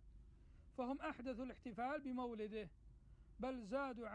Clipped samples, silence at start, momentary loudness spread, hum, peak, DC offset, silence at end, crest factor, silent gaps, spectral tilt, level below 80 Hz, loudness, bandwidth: under 0.1%; 0 s; 22 LU; none; -32 dBFS; under 0.1%; 0 s; 16 dB; none; -6.5 dB/octave; -66 dBFS; -48 LUFS; 10 kHz